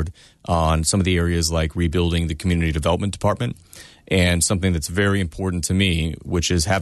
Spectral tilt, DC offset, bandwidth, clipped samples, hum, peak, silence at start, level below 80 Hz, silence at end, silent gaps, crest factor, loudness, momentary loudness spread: -4.5 dB/octave; under 0.1%; 12.5 kHz; under 0.1%; none; -6 dBFS; 0 s; -32 dBFS; 0 s; none; 16 dB; -20 LUFS; 6 LU